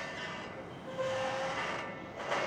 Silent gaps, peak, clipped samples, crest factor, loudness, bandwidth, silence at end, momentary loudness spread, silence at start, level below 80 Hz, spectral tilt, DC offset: none; -22 dBFS; under 0.1%; 16 dB; -38 LUFS; 11.5 kHz; 0 s; 9 LU; 0 s; -66 dBFS; -4 dB/octave; under 0.1%